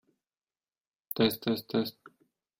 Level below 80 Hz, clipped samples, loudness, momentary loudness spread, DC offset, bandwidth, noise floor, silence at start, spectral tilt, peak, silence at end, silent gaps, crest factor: -70 dBFS; under 0.1%; -31 LUFS; 10 LU; under 0.1%; 16 kHz; under -90 dBFS; 1.15 s; -5.5 dB/octave; -12 dBFS; 0.5 s; none; 22 dB